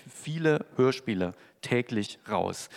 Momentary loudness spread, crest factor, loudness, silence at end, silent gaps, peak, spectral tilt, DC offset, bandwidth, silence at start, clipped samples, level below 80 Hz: 8 LU; 18 dB; -29 LUFS; 0 s; none; -12 dBFS; -5.5 dB/octave; under 0.1%; 14.5 kHz; 0.05 s; under 0.1%; -76 dBFS